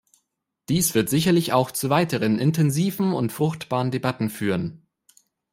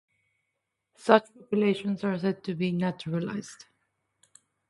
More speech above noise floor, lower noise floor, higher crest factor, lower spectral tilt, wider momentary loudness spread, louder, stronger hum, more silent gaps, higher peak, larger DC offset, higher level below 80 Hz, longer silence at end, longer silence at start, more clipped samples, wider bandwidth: about the same, 55 dB vs 55 dB; second, -77 dBFS vs -82 dBFS; second, 18 dB vs 26 dB; about the same, -5.5 dB/octave vs -6.5 dB/octave; second, 6 LU vs 12 LU; first, -22 LUFS vs -28 LUFS; neither; neither; about the same, -4 dBFS vs -4 dBFS; neither; first, -58 dBFS vs -72 dBFS; second, 0.75 s vs 1.15 s; second, 0.7 s vs 1 s; neither; first, 16.5 kHz vs 11.5 kHz